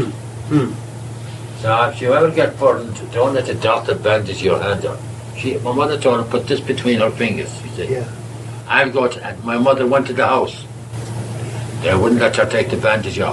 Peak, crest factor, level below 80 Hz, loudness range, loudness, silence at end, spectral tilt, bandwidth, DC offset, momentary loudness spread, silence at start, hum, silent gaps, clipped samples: 0 dBFS; 18 dB; -50 dBFS; 2 LU; -17 LUFS; 0 s; -5.5 dB/octave; 12.5 kHz; under 0.1%; 15 LU; 0 s; none; none; under 0.1%